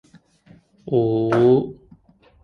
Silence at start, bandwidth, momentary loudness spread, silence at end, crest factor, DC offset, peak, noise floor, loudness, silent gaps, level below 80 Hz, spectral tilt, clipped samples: 0.85 s; 6.4 kHz; 8 LU; 0.7 s; 16 dB; under 0.1%; -6 dBFS; -54 dBFS; -19 LUFS; none; -54 dBFS; -9.5 dB/octave; under 0.1%